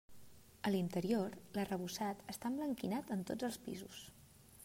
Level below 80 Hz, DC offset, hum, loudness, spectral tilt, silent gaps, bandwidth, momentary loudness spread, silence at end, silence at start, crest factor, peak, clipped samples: -72 dBFS; under 0.1%; none; -41 LUFS; -5.5 dB/octave; none; 16 kHz; 12 LU; 0 s; 0.1 s; 18 dB; -24 dBFS; under 0.1%